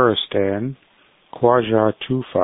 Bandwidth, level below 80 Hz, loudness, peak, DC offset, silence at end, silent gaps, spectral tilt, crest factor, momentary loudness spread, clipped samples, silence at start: 4 kHz; -52 dBFS; -19 LUFS; -2 dBFS; under 0.1%; 0 s; none; -11 dB/octave; 18 dB; 9 LU; under 0.1%; 0 s